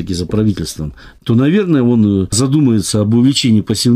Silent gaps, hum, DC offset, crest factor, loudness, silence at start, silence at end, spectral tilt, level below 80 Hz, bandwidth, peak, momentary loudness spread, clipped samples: none; none; under 0.1%; 10 dB; -13 LUFS; 0 s; 0 s; -5.5 dB/octave; -38 dBFS; 15.5 kHz; -2 dBFS; 11 LU; under 0.1%